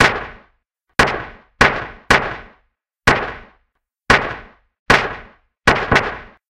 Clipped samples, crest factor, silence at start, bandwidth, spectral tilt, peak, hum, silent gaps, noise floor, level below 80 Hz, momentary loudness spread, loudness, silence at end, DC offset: under 0.1%; 20 dB; 0 s; 17.5 kHz; -4 dB/octave; 0 dBFS; none; 4.79-4.86 s; -69 dBFS; -36 dBFS; 19 LU; -17 LUFS; 0.25 s; under 0.1%